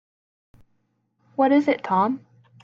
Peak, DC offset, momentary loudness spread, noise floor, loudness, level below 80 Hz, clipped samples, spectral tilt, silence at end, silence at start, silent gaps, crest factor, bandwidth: -8 dBFS; under 0.1%; 14 LU; -70 dBFS; -21 LUFS; -68 dBFS; under 0.1%; -7.5 dB/octave; 0.45 s; 1.4 s; none; 18 dB; 7 kHz